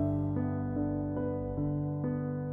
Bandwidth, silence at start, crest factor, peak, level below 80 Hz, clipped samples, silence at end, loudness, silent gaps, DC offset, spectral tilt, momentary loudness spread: 2.4 kHz; 0 s; 12 dB; -20 dBFS; -50 dBFS; under 0.1%; 0 s; -33 LUFS; none; under 0.1%; -13 dB/octave; 2 LU